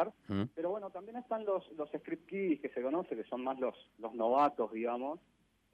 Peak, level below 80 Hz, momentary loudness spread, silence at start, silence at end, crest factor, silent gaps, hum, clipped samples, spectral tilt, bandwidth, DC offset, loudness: -20 dBFS; -80 dBFS; 11 LU; 0 s; 0.55 s; 18 dB; none; none; under 0.1%; -8.5 dB/octave; 8.2 kHz; under 0.1%; -37 LUFS